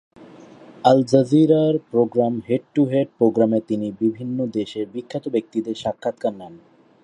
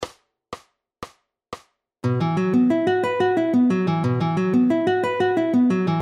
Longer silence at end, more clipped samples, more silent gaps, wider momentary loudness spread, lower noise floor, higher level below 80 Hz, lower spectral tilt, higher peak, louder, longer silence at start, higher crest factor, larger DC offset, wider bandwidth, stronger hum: first, 0.45 s vs 0 s; neither; neither; second, 12 LU vs 21 LU; second, -44 dBFS vs -49 dBFS; about the same, -64 dBFS vs -60 dBFS; about the same, -8 dB/octave vs -8 dB/octave; first, 0 dBFS vs -10 dBFS; about the same, -20 LUFS vs -20 LUFS; first, 0.2 s vs 0 s; first, 20 dB vs 12 dB; neither; about the same, 10.5 kHz vs 9.8 kHz; neither